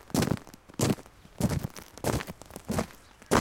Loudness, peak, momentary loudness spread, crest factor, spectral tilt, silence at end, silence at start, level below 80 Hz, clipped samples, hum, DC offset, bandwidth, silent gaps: -32 LUFS; -8 dBFS; 12 LU; 24 dB; -5 dB/octave; 0 s; 0.15 s; -48 dBFS; under 0.1%; none; under 0.1%; 17 kHz; none